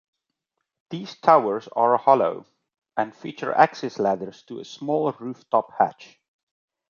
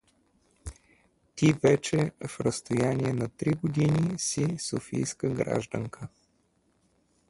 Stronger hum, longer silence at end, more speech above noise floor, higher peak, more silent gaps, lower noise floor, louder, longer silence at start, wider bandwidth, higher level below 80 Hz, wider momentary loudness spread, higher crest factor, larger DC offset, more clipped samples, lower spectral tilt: neither; second, 0.85 s vs 1.2 s; first, 59 dB vs 42 dB; first, -2 dBFS vs -8 dBFS; neither; first, -81 dBFS vs -70 dBFS; first, -22 LUFS vs -28 LUFS; first, 0.9 s vs 0.65 s; second, 7.2 kHz vs 11.5 kHz; second, -74 dBFS vs -56 dBFS; second, 17 LU vs 21 LU; about the same, 22 dB vs 20 dB; neither; neither; about the same, -6 dB/octave vs -5.5 dB/octave